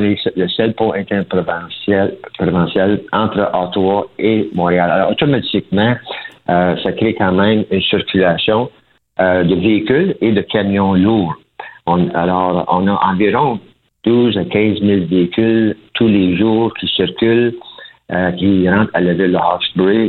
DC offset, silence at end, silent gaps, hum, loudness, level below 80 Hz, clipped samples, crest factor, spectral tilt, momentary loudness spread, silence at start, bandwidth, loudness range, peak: under 0.1%; 0 s; none; none; -14 LUFS; -46 dBFS; under 0.1%; 14 dB; -9.5 dB/octave; 6 LU; 0 s; 4.4 kHz; 2 LU; 0 dBFS